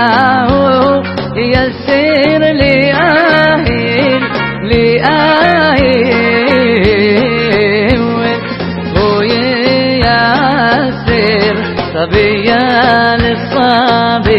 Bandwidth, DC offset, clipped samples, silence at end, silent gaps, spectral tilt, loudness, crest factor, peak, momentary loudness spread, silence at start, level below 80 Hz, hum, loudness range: 6 kHz; under 0.1%; 0.2%; 0 s; none; -8 dB/octave; -10 LUFS; 10 dB; 0 dBFS; 5 LU; 0 s; -30 dBFS; none; 2 LU